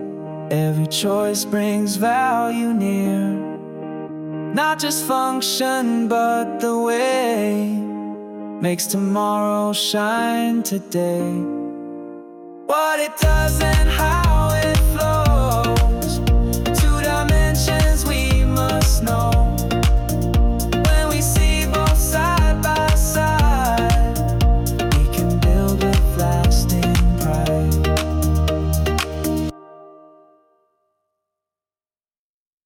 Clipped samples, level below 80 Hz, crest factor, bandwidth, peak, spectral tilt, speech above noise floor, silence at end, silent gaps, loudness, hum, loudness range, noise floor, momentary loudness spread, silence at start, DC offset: under 0.1%; -22 dBFS; 12 dB; 18 kHz; -6 dBFS; -5 dB/octave; over 71 dB; 2.75 s; none; -19 LUFS; none; 4 LU; under -90 dBFS; 8 LU; 0 s; under 0.1%